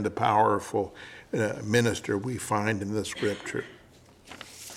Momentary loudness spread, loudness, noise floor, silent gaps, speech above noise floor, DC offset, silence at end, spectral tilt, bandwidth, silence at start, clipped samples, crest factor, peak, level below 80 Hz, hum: 20 LU; -28 LUFS; -55 dBFS; none; 27 dB; under 0.1%; 0 s; -5 dB/octave; 16 kHz; 0 s; under 0.1%; 20 dB; -8 dBFS; -62 dBFS; none